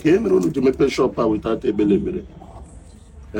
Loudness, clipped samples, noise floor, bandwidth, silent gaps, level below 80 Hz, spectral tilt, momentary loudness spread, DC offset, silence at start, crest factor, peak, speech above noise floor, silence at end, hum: -19 LUFS; under 0.1%; -42 dBFS; 16 kHz; none; -42 dBFS; -7 dB/octave; 10 LU; under 0.1%; 0 s; 14 dB; -6 dBFS; 24 dB; 0 s; none